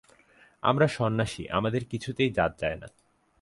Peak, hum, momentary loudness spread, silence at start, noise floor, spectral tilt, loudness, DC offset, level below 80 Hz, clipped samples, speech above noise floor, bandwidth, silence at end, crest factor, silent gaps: -8 dBFS; none; 9 LU; 0.65 s; -59 dBFS; -6 dB/octave; -28 LUFS; under 0.1%; -52 dBFS; under 0.1%; 32 dB; 11.5 kHz; 0.55 s; 20 dB; none